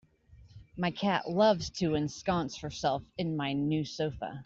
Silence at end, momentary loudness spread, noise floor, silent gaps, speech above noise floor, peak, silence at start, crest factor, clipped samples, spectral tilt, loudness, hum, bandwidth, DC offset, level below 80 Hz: 0 s; 9 LU; -58 dBFS; none; 27 dB; -14 dBFS; 0.3 s; 18 dB; under 0.1%; -5.5 dB/octave; -31 LUFS; none; 7.8 kHz; under 0.1%; -58 dBFS